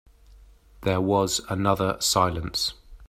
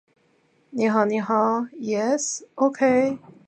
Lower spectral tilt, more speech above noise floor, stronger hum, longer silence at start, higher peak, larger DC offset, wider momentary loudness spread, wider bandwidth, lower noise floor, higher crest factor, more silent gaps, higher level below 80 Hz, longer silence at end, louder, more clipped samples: about the same, -4 dB/octave vs -4.5 dB/octave; second, 28 dB vs 41 dB; neither; about the same, 0.8 s vs 0.75 s; about the same, -4 dBFS vs -6 dBFS; neither; about the same, 6 LU vs 7 LU; first, 15.5 kHz vs 9.4 kHz; second, -52 dBFS vs -63 dBFS; about the same, 22 dB vs 18 dB; neither; first, -48 dBFS vs -72 dBFS; second, 0.05 s vs 0.3 s; about the same, -24 LUFS vs -22 LUFS; neither